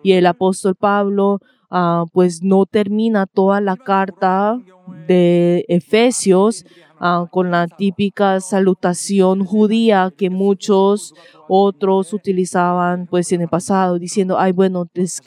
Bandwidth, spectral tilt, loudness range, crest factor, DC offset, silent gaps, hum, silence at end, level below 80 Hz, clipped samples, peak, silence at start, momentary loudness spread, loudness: 12.5 kHz; -6 dB/octave; 1 LU; 14 dB; under 0.1%; none; none; 0.05 s; -68 dBFS; under 0.1%; 0 dBFS; 0.05 s; 6 LU; -16 LUFS